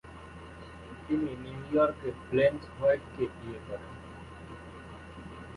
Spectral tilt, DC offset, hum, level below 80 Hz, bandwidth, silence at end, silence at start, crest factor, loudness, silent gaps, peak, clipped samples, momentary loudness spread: -7.5 dB/octave; under 0.1%; none; -54 dBFS; 11.5 kHz; 0 s; 0.05 s; 20 dB; -31 LUFS; none; -14 dBFS; under 0.1%; 20 LU